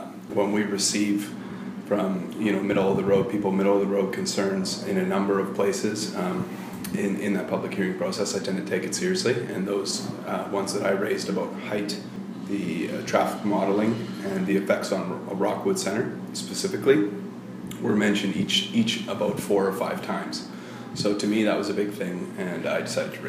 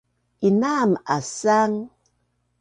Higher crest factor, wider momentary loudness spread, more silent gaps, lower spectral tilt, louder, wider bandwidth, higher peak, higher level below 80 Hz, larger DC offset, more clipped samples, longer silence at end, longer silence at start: about the same, 20 dB vs 16 dB; about the same, 9 LU vs 8 LU; neither; about the same, -4.5 dB/octave vs -5.5 dB/octave; second, -26 LUFS vs -21 LUFS; first, 15.5 kHz vs 10 kHz; about the same, -6 dBFS vs -8 dBFS; about the same, -66 dBFS vs -66 dBFS; neither; neither; second, 0 s vs 0.75 s; second, 0 s vs 0.4 s